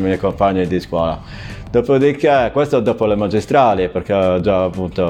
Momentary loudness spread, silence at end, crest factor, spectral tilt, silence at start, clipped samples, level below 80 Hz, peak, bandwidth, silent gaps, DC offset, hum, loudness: 6 LU; 0 s; 16 dB; -7.5 dB/octave; 0 s; under 0.1%; -38 dBFS; 0 dBFS; 11.5 kHz; none; under 0.1%; none; -16 LUFS